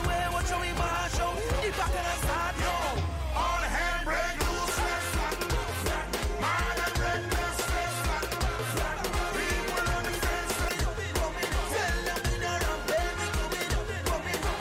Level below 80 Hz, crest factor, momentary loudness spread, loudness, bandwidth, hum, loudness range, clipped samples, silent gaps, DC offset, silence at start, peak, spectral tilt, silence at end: -34 dBFS; 12 dB; 2 LU; -30 LUFS; 16 kHz; none; 1 LU; under 0.1%; none; under 0.1%; 0 s; -18 dBFS; -3.5 dB/octave; 0 s